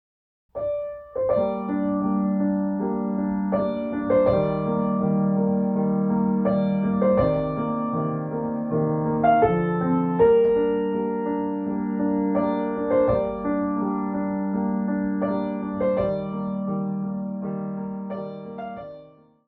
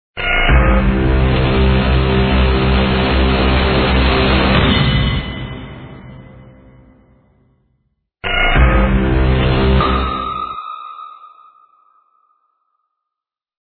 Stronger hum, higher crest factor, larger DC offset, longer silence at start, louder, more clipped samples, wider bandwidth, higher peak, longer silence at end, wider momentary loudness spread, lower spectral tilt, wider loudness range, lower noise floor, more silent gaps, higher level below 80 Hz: neither; about the same, 16 dB vs 14 dB; neither; first, 0.55 s vs 0.15 s; second, -24 LUFS vs -14 LUFS; neither; about the same, 4.4 kHz vs 4.6 kHz; second, -6 dBFS vs 0 dBFS; second, 0.4 s vs 2.6 s; second, 10 LU vs 16 LU; first, -12 dB/octave vs -9.5 dB/octave; second, 5 LU vs 13 LU; second, -49 dBFS vs -84 dBFS; neither; second, -50 dBFS vs -18 dBFS